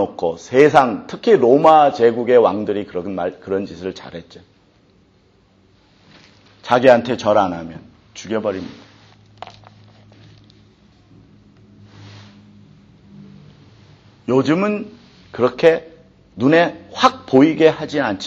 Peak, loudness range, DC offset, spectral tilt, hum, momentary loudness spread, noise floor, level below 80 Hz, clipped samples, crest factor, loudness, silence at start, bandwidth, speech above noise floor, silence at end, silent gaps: 0 dBFS; 16 LU; under 0.1%; -6 dB/octave; none; 23 LU; -55 dBFS; -58 dBFS; under 0.1%; 18 dB; -16 LUFS; 0 s; 8 kHz; 39 dB; 0 s; none